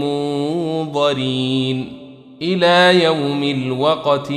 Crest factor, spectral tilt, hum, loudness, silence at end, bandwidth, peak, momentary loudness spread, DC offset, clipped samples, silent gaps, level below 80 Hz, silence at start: 16 dB; -5.5 dB/octave; none; -17 LUFS; 0 s; 12 kHz; -2 dBFS; 10 LU; under 0.1%; under 0.1%; none; -60 dBFS; 0 s